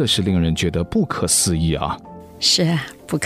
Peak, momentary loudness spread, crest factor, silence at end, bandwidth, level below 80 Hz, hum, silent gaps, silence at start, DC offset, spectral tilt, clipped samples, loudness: -4 dBFS; 10 LU; 16 dB; 0 s; 16 kHz; -36 dBFS; none; none; 0 s; under 0.1%; -4 dB/octave; under 0.1%; -18 LUFS